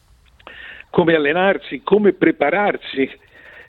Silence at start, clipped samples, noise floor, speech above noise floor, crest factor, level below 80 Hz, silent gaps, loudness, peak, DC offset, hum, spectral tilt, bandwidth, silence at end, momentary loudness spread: 0.45 s; under 0.1%; -46 dBFS; 29 dB; 16 dB; -54 dBFS; none; -17 LUFS; -2 dBFS; under 0.1%; none; -8.5 dB/octave; 4.3 kHz; 0.05 s; 13 LU